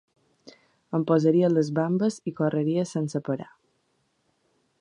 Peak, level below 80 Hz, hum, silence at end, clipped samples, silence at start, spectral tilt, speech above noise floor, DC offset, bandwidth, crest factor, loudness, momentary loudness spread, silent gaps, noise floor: -8 dBFS; -72 dBFS; none; 1.4 s; under 0.1%; 0.45 s; -7.5 dB/octave; 47 dB; under 0.1%; 11 kHz; 18 dB; -25 LUFS; 10 LU; none; -71 dBFS